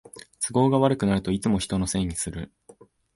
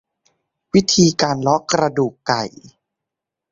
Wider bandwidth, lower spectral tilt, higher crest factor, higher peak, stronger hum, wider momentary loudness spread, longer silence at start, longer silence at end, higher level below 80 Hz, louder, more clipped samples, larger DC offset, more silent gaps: first, 11.5 kHz vs 7.6 kHz; about the same, -5.5 dB/octave vs -4.5 dB/octave; about the same, 18 dB vs 18 dB; second, -6 dBFS vs -2 dBFS; neither; first, 15 LU vs 7 LU; second, 0.15 s vs 0.75 s; second, 0.7 s vs 0.85 s; first, -44 dBFS vs -52 dBFS; second, -24 LUFS vs -17 LUFS; neither; neither; neither